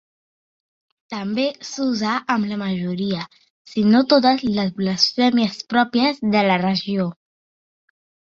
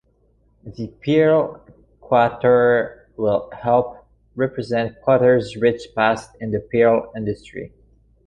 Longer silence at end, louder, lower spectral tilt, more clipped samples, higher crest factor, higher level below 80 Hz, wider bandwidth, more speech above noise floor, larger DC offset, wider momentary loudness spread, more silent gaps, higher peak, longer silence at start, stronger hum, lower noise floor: first, 1.15 s vs 0.6 s; about the same, -20 LUFS vs -19 LUFS; second, -5.5 dB/octave vs -7.5 dB/octave; neither; about the same, 18 dB vs 16 dB; second, -60 dBFS vs -52 dBFS; second, 7.6 kHz vs 9.4 kHz; first, over 71 dB vs 41 dB; neither; second, 10 LU vs 16 LU; first, 3.50-3.65 s vs none; about the same, -2 dBFS vs -2 dBFS; first, 1.1 s vs 0.65 s; neither; first, under -90 dBFS vs -60 dBFS